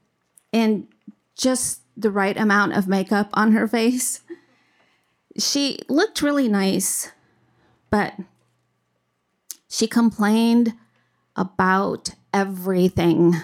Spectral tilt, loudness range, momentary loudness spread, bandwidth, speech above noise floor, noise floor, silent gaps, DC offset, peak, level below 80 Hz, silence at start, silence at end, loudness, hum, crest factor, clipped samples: -4.5 dB/octave; 4 LU; 11 LU; 16.5 kHz; 52 dB; -72 dBFS; none; under 0.1%; -6 dBFS; -56 dBFS; 0.55 s; 0 s; -21 LUFS; none; 16 dB; under 0.1%